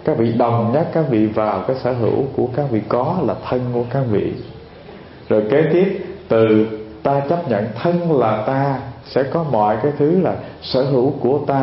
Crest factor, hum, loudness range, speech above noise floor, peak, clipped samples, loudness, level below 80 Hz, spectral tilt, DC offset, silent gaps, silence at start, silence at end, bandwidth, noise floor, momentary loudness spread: 16 dB; none; 3 LU; 21 dB; -2 dBFS; under 0.1%; -18 LUFS; -50 dBFS; -12.5 dB/octave; under 0.1%; none; 0 s; 0 s; 5.8 kHz; -38 dBFS; 8 LU